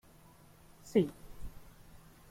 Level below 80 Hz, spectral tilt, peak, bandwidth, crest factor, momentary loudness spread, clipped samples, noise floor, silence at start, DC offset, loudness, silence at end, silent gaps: -56 dBFS; -7 dB/octave; -16 dBFS; 16.5 kHz; 24 dB; 25 LU; under 0.1%; -59 dBFS; 0.85 s; under 0.1%; -33 LUFS; 0.3 s; none